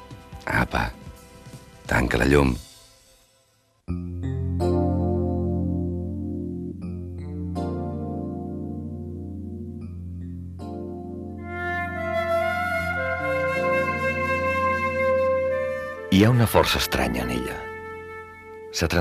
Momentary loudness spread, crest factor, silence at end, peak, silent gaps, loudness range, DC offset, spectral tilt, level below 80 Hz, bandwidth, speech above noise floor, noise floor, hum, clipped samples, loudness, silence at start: 16 LU; 20 dB; 0 s; -4 dBFS; none; 11 LU; under 0.1%; -6 dB/octave; -40 dBFS; 14.5 kHz; 43 dB; -64 dBFS; none; under 0.1%; -25 LUFS; 0 s